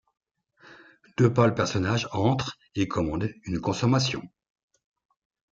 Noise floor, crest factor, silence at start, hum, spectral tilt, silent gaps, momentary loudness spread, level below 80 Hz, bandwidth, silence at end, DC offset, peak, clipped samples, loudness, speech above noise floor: -57 dBFS; 20 dB; 0.7 s; none; -6 dB/octave; none; 9 LU; -54 dBFS; 7.8 kHz; 1.25 s; under 0.1%; -6 dBFS; under 0.1%; -26 LUFS; 32 dB